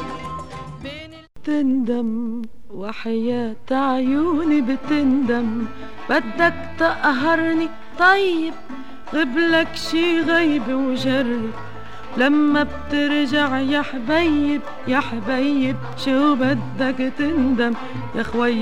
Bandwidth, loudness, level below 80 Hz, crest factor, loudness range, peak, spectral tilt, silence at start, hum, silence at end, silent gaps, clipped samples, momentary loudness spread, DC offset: 11 kHz; -20 LUFS; -46 dBFS; 18 dB; 3 LU; -4 dBFS; -5.5 dB/octave; 0 s; none; 0 s; none; under 0.1%; 15 LU; 3%